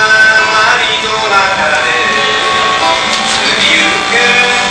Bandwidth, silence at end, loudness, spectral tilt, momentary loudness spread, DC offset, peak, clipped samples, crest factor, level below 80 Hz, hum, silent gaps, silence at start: 11 kHz; 0 s; -8 LUFS; -1 dB/octave; 4 LU; 0.2%; 0 dBFS; 0.3%; 10 dB; -42 dBFS; none; none; 0 s